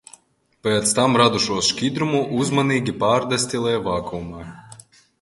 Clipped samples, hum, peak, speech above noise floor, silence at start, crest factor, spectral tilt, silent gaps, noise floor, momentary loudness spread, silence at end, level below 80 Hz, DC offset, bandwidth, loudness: under 0.1%; none; 0 dBFS; 39 dB; 0.65 s; 20 dB; -4 dB/octave; none; -59 dBFS; 14 LU; 0.45 s; -50 dBFS; under 0.1%; 11.5 kHz; -20 LUFS